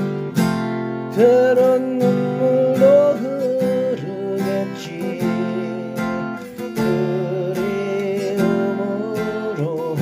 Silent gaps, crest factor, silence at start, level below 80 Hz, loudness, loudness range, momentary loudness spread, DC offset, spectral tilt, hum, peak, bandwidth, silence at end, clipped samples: none; 16 dB; 0 s; -56 dBFS; -19 LUFS; 7 LU; 11 LU; under 0.1%; -7 dB/octave; none; -4 dBFS; 16 kHz; 0 s; under 0.1%